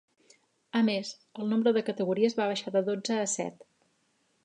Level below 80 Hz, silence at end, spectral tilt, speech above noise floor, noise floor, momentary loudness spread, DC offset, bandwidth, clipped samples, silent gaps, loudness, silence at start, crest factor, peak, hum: -82 dBFS; 0.9 s; -4.5 dB/octave; 44 dB; -72 dBFS; 8 LU; under 0.1%; 10 kHz; under 0.1%; none; -29 LUFS; 0.75 s; 18 dB; -12 dBFS; none